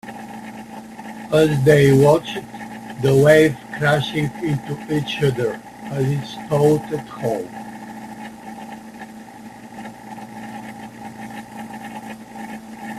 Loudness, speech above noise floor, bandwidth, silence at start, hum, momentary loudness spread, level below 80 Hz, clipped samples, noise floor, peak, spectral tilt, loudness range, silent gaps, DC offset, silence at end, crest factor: -18 LUFS; 21 dB; 14.5 kHz; 0.05 s; 60 Hz at -50 dBFS; 22 LU; -52 dBFS; under 0.1%; -38 dBFS; 0 dBFS; -6.5 dB/octave; 19 LU; none; under 0.1%; 0 s; 20 dB